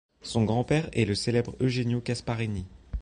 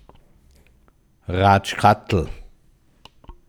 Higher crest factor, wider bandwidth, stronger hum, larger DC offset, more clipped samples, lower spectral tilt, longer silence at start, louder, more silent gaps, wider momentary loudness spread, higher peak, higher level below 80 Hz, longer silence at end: second, 16 dB vs 22 dB; second, 10.5 kHz vs 13 kHz; neither; neither; neither; about the same, -6 dB/octave vs -6 dB/octave; second, 0.25 s vs 1.3 s; second, -28 LUFS vs -19 LUFS; neither; second, 7 LU vs 15 LU; second, -10 dBFS vs 0 dBFS; about the same, -44 dBFS vs -42 dBFS; second, 0 s vs 0.15 s